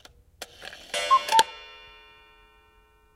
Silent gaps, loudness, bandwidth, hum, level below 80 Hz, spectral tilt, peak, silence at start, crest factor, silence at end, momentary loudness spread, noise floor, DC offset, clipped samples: none; -23 LUFS; 16 kHz; none; -62 dBFS; 0.5 dB/octave; -2 dBFS; 0.4 s; 26 dB; 1.45 s; 24 LU; -60 dBFS; under 0.1%; under 0.1%